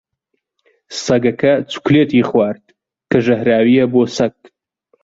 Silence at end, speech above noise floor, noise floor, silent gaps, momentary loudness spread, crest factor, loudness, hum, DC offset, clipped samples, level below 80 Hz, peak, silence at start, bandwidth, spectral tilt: 0.75 s; 58 dB; -72 dBFS; none; 8 LU; 14 dB; -15 LUFS; none; under 0.1%; under 0.1%; -52 dBFS; -2 dBFS; 0.9 s; 7.8 kHz; -6 dB/octave